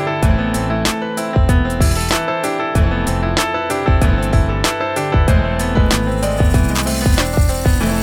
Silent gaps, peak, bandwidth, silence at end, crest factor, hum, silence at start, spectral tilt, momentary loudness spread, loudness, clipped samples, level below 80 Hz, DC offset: none; 0 dBFS; 19.5 kHz; 0 s; 14 dB; none; 0 s; -5.5 dB/octave; 3 LU; -16 LUFS; under 0.1%; -20 dBFS; under 0.1%